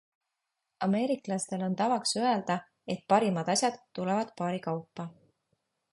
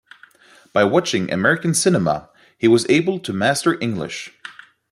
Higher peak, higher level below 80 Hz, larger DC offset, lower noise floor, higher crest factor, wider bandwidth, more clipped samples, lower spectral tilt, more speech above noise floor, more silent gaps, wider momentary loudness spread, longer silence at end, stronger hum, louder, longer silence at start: second, -10 dBFS vs -2 dBFS; second, -76 dBFS vs -58 dBFS; neither; first, -85 dBFS vs -49 dBFS; about the same, 22 dB vs 18 dB; second, 11.5 kHz vs 13.5 kHz; neither; about the same, -4.5 dB/octave vs -4.5 dB/octave; first, 55 dB vs 31 dB; neither; about the same, 11 LU vs 13 LU; first, 0.8 s vs 0.4 s; neither; second, -30 LUFS vs -18 LUFS; about the same, 0.8 s vs 0.75 s